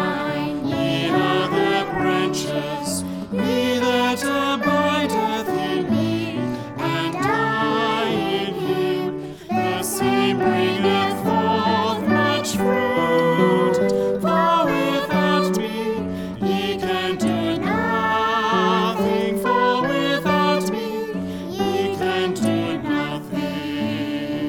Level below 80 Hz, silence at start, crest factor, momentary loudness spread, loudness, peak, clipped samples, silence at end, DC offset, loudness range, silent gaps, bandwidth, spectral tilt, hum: -52 dBFS; 0 s; 16 dB; 7 LU; -21 LUFS; -4 dBFS; under 0.1%; 0 s; under 0.1%; 3 LU; none; 19.5 kHz; -5 dB/octave; none